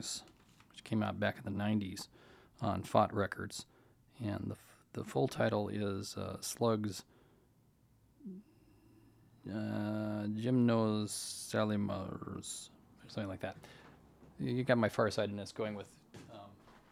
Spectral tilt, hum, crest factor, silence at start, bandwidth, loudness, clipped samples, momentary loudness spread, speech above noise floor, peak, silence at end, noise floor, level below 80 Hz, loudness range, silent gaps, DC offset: -5.5 dB/octave; none; 24 dB; 0 s; 16 kHz; -37 LUFS; under 0.1%; 22 LU; 33 dB; -14 dBFS; 0.15 s; -69 dBFS; -70 dBFS; 6 LU; none; under 0.1%